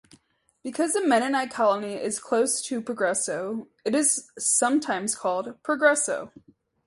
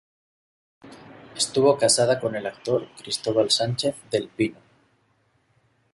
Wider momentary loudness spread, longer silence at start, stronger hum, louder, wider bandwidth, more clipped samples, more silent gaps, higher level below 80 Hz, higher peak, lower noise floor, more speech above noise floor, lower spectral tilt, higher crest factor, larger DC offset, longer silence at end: about the same, 10 LU vs 10 LU; second, 0.65 s vs 0.85 s; neither; about the same, -25 LUFS vs -23 LUFS; about the same, 12 kHz vs 11.5 kHz; neither; neither; second, -72 dBFS vs -64 dBFS; about the same, -6 dBFS vs -8 dBFS; about the same, -63 dBFS vs -66 dBFS; second, 38 dB vs 43 dB; second, -2 dB/octave vs -3.5 dB/octave; about the same, 20 dB vs 18 dB; neither; second, 0.6 s vs 1.4 s